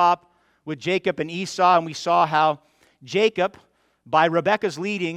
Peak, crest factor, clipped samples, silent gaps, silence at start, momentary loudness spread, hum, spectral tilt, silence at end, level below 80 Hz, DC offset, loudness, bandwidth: -4 dBFS; 18 dB; under 0.1%; none; 0 s; 9 LU; none; -5 dB/octave; 0 s; -68 dBFS; under 0.1%; -21 LUFS; 12.5 kHz